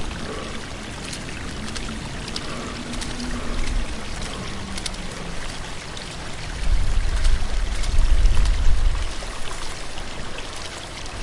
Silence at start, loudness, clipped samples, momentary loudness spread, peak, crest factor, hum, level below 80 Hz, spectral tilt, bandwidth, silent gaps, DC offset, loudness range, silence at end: 0 s; -28 LUFS; under 0.1%; 9 LU; -4 dBFS; 18 dB; none; -24 dBFS; -4 dB/octave; 11.5 kHz; none; under 0.1%; 5 LU; 0 s